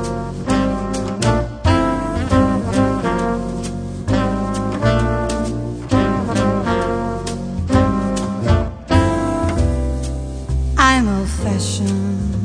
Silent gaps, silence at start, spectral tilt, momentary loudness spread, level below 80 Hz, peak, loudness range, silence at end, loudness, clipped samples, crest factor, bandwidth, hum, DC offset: none; 0 s; -6 dB/octave; 8 LU; -26 dBFS; 0 dBFS; 2 LU; 0 s; -18 LUFS; under 0.1%; 18 dB; 10.5 kHz; none; under 0.1%